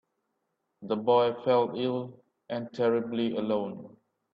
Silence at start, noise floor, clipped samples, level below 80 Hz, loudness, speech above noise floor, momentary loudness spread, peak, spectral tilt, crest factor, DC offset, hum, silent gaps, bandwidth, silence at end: 0.8 s; -80 dBFS; under 0.1%; -74 dBFS; -29 LUFS; 52 dB; 14 LU; -12 dBFS; -8 dB/octave; 18 dB; under 0.1%; none; none; 6 kHz; 0.45 s